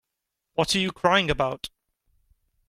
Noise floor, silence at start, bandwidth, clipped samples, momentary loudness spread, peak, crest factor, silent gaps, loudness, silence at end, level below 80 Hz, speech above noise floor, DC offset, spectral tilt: -83 dBFS; 0.6 s; 16 kHz; under 0.1%; 14 LU; -6 dBFS; 22 dB; none; -24 LUFS; 1 s; -48 dBFS; 60 dB; under 0.1%; -4 dB/octave